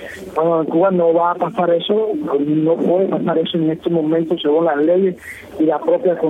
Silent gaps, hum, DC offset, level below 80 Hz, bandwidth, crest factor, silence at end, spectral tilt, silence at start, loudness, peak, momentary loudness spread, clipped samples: none; none; under 0.1%; -58 dBFS; 10 kHz; 12 dB; 0 s; -8 dB/octave; 0 s; -17 LUFS; -4 dBFS; 4 LU; under 0.1%